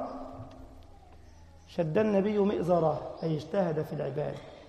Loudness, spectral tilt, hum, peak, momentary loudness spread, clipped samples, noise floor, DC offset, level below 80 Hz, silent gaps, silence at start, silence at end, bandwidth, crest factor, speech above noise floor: -30 LUFS; -8.5 dB/octave; none; -14 dBFS; 15 LU; under 0.1%; -52 dBFS; under 0.1%; -56 dBFS; none; 0 s; 0 s; 14 kHz; 18 dB; 24 dB